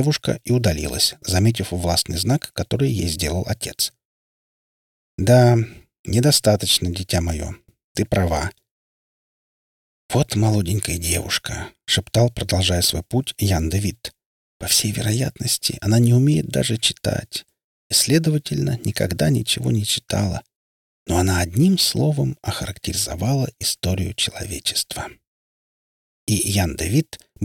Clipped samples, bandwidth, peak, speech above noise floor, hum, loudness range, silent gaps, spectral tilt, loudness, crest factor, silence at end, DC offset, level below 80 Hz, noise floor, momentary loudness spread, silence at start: under 0.1%; 18 kHz; -2 dBFS; over 70 dB; none; 5 LU; 4.05-5.18 s, 5.99-6.04 s, 7.84-7.95 s, 8.71-10.09 s, 14.26-14.60 s, 17.64-17.90 s, 20.55-21.06 s, 25.27-26.27 s; -4.5 dB/octave; -20 LUFS; 18 dB; 0 s; under 0.1%; -40 dBFS; under -90 dBFS; 11 LU; 0 s